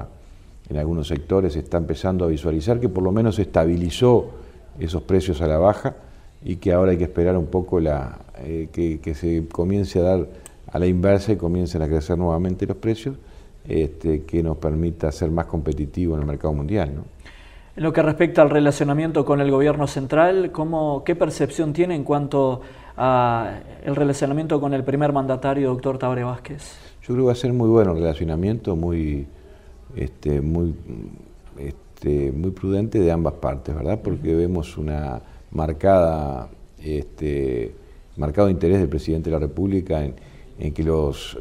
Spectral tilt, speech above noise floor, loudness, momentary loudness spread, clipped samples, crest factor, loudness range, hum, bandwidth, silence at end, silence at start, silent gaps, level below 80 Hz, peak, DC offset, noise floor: -8 dB/octave; 23 dB; -22 LUFS; 14 LU; under 0.1%; 20 dB; 4 LU; none; 13 kHz; 0 s; 0 s; none; -34 dBFS; -2 dBFS; under 0.1%; -44 dBFS